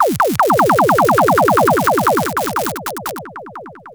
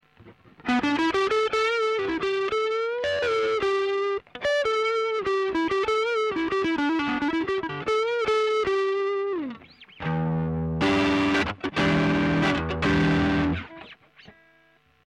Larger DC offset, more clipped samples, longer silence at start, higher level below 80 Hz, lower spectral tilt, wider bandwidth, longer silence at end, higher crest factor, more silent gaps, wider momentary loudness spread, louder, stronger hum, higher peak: neither; neither; second, 0 s vs 0.25 s; about the same, -48 dBFS vs -46 dBFS; about the same, -5 dB/octave vs -6 dB/octave; first, over 20 kHz vs 11 kHz; second, 0 s vs 0.75 s; about the same, 14 dB vs 12 dB; neither; first, 19 LU vs 6 LU; first, -14 LUFS vs -25 LUFS; neither; first, 0 dBFS vs -12 dBFS